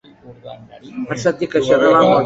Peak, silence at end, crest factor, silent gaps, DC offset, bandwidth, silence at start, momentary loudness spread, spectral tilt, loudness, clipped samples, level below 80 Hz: -2 dBFS; 0 s; 14 dB; none; under 0.1%; 8 kHz; 0.25 s; 25 LU; -5.5 dB/octave; -15 LUFS; under 0.1%; -54 dBFS